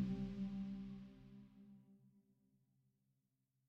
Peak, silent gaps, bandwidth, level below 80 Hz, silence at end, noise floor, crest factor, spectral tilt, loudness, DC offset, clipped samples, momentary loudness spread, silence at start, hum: -32 dBFS; none; 6.4 kHz; -66 dBFS; 1.5 s; -86 dBFS; 20 dB; -9 dB/octave; -48 LUFS; under 0.1%; under 0.1%; 20 LU; 0 s; none